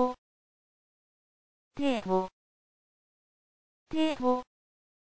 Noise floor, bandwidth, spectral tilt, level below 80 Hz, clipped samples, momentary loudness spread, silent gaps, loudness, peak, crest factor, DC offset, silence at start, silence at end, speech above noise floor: under -90 dBFS; 8 kHz; -6 dB/octave; -62 dBFS; under 0.1%; 14 LU; 0.18-1.71 s, 2.33-3.86 s; -31 LUFS; -16 dBFS; 18 dB; under 0.1%; 0 s; 0.7 s; over 62 dB